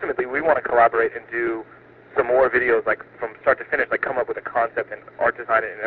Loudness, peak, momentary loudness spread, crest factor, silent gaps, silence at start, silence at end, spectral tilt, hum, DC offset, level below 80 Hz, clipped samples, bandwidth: -21 LUFS; -2 dBFS; 9 LU; 20 dB; none; 0 s; 0 s; -3.5 dB/octave; none; under 0.1%; -56 dBFS; under 0.1%; 4.6 kHz